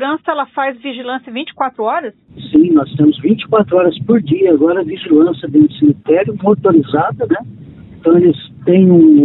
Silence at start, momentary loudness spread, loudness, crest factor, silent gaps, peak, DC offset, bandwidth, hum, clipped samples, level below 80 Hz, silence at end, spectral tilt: 0 s; 10 LU; -13 LUFS; 12 dB; none; 0 dBFS; under 0.1%; 4.1 kHz; none; under 0.1%; -52 dBFS; 0 s; -12 dB/octave